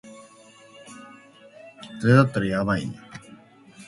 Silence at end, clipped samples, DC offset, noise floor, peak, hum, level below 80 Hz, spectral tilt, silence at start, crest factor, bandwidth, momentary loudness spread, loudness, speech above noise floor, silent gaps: 0.05 s; under 0.1%; under 0.1%; -51 dBFS; -2 dBFS; none; -56 dBFS; -7.5 dB/octave; 0.05 s; 24 dB; 11.5 kHz; 26 LU; -22 LUFS; 30 dB; none